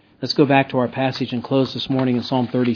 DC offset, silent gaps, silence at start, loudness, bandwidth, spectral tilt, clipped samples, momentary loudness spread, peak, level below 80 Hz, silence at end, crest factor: under 0.1%; none; 0.2 s; -20 LUFS; 5.4 kHz; -7 dB/octave; under 0.1%; 6 LU; 0 dBFS; -60 dBFS; 0 s; 18 dB